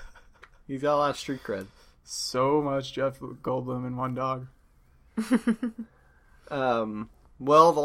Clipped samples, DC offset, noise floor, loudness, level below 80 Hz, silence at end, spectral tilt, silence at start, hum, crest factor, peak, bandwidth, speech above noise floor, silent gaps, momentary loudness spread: under 0.1%; under 0.1%; -59 dBFS; -28 LUFS; -58 dBFS; 0 s; -5.5 dB/octave; 0 s; none; 24 dB; -4 dBFS; 16 kHz; 33 dB; none; 14 LU